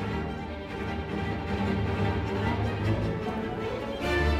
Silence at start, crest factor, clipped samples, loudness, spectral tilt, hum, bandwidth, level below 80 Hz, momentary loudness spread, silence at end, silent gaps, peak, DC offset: 0 s; 14 dB; under 0.1%; -30 LUFS; -7 dB/octave; none; 13 kHz; -38 dBFS; 6 LU; 0 s; none; -14 dBFS; under 0.1%